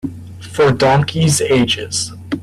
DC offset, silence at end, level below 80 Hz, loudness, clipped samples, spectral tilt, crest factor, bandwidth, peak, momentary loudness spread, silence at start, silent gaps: under 0.1%; 0 s; -44 dBFS; -14 LUFS; under 0.1%; -4.5 dB/octave; 14 dB; 15 kHz; -2 dBFS; 14 LU; 0.05 s; none